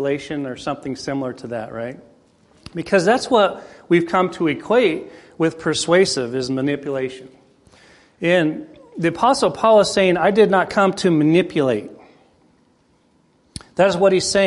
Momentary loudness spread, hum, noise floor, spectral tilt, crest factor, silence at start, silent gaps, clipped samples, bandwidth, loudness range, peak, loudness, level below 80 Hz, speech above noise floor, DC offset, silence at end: 15 LU; none; -59 dBFS; -5 dB/octave; 18 dB; 0 s; none; under 0.1%; 11.5 kHz; 5 LU; -2 dBFS; -18 LUFS; -54 dBFS; 41 dB; under 0.1%; 0 s